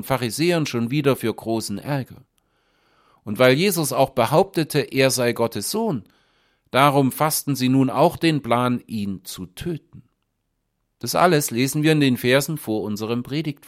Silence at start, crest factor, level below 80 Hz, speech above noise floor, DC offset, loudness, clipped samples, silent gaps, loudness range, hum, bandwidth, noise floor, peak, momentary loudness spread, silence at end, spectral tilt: 0 s; 20 dB; -56 dBFS; 53 dB; under 0.1%; -21 LUFS; under 0.1%; none; 4 LU; none; 16.5 kHz; -74 dBFS; 0 dBFS; 13 LU; 0.15 s; -5 dB/octave